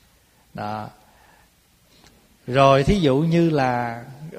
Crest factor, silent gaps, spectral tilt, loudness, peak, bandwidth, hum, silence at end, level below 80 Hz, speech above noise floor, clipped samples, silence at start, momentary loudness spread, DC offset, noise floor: 22 dB; none; -7 dB/octave; -19 LUFS; -2 dBFS; 14.5 kHz; none; 0 s; -42 dBFS; 38 dB; under 0.1%; 0.55 s; 22 LU; under 0.1%; -58 dBFS